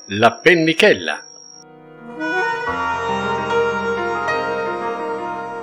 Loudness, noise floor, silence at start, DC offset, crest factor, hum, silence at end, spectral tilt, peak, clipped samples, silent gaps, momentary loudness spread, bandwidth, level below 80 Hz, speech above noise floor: -18 LUFS; -42 dBFS; 0.05 s; under 0.1%; 20 dB; none; 0 s; -4.5 dB/octave; 0 dBFS; under 0.1%; none; 13 LU; 16 kHz; -54 dBFS; 27 dB